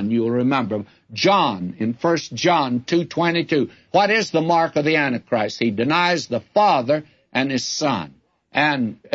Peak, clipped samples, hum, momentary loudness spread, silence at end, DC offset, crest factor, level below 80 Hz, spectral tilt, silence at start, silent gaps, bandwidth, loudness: -4 dBFS; under 0.1%; none; 8 LU; 0.05 s; under 0.1%; 16 dB; -64 dBFS; -5 dB/octave; 0 s; none; 8 kHz; -20 LUFS